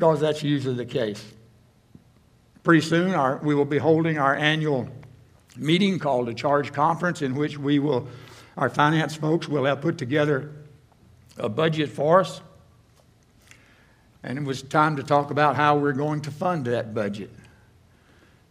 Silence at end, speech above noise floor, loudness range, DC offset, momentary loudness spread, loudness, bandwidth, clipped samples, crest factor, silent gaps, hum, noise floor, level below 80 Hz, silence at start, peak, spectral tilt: 1.2 s; 35 dB; 4 LU; under 0.1%; 11 LU; -23 LUFS; 13 kHz; under 0.1%; 20 dB; none; none; -58 dBFS; -64 dBFS; 0 s; -4 dBFS; -6.5 dB/octave